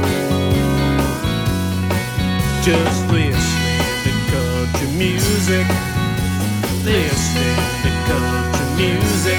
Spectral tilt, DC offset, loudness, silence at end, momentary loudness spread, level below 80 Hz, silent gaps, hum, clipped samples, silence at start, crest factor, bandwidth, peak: -5 dB/octave; under 0.1%; -18 LUFS; 0 s; 3 LU; -28 dBFS; none; none; under 0.1%; 0 s; 14 dB; 19.5 kHz; -2 dBFS